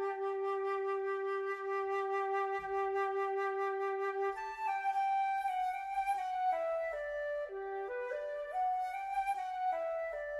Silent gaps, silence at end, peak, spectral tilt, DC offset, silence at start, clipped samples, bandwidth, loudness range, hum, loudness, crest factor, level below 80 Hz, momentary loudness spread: none; 0 s; -26 dBFS; -3.5 dB/octave; under 0.1%; 0 s; under 0.1%; 12.5 kHz; 2 LU; none; -36 LUFS; 10 dB; -70 dBFS; 5 LU